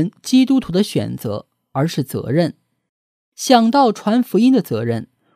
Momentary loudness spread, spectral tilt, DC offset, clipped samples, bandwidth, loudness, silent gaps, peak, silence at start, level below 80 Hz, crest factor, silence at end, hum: 12 LU; -6 dB/octave; under 0.1%; under 0.1%; 15.5 kHz; -17 LUFS; 2.89-3.32 s; 0 dBFS; 0 s; -54 dBFS; 18 dB; 0.3 s; none